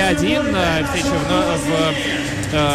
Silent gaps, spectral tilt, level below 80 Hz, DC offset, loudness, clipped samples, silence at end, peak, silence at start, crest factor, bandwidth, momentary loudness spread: none; -4.5 dB/octave; -34 dBFS; under 0.1%; -18 LUFS; under 0.1%; 0 s; -6 dBFS; 0 s; 12 dB; 15.5 kHz; 3 LU